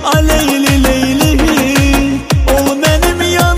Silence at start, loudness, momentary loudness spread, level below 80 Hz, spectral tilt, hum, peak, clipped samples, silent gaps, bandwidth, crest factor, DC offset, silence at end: 0 s; -11 LUFS; 2 LU; -18 dBFS; -4.5 dB/octave; none; 0 dBFS; under 0.1%; none; 16.5 kHz; 10 dB; under 0.1%; 0 s